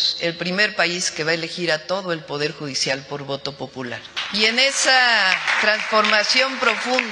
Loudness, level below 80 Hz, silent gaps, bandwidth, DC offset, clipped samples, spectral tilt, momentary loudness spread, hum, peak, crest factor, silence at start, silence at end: -19 LUFS; -66 dBFS; none; 12 kHz; under 0.1%; under 0.1%; -2 dB/octave; 13 LU; none; 0 dBFS; 20 dB; 0 s; 0 s